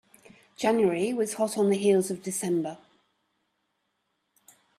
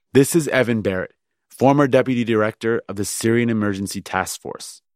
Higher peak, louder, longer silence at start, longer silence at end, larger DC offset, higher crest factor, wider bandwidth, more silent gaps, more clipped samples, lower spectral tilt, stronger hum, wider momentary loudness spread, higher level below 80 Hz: second, -12 dBFS vs -2 dBFS; second, -26 LUFS vs -20 LUFS; first, 0.6 s vs 0.15 s; first, 2 s vs 0.2 s; neither; about the same, 18 dB vs 18 dB; second, 14 kHz vs 16 kHz; neither; neither; about the same, -5 dB/octave vs -5.5 dB/octave; neither; second, 7 LU vs 11 LU; second, -74 dBFS vs -58 dBFS